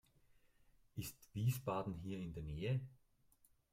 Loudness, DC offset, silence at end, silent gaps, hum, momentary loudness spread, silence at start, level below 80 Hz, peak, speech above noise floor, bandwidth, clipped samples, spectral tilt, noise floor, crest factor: -44 LUFS; under 0.1%; 0.75 s; none; none; 10 LU; 0.95 s; -64 dBFS; -28 dBFS; 31 dB; 16 kHz; under 0.1%; -6.5 dB/octave; -74 dBFS; 18 dB